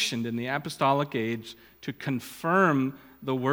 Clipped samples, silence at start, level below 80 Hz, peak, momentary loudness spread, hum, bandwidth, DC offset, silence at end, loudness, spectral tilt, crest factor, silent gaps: under 0.1%; 0 s; -68 dBFS; -8 dBFS; 16 LU; none; 19.5 kHz; under 0.1%; 0 s; -28 LUFS; -5 dB/octave; 20 dB; none